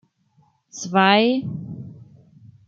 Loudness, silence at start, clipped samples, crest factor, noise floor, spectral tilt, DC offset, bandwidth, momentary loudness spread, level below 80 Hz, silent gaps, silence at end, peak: -18 LUFS; 0.75 s; under 0.1%; 20 dB; -61 dBFS; -4.5 dB/octave; under 0.1%; 7.6 kHz; 24 LU; -64 dBFS; none; 0.65 s; -4 dBFS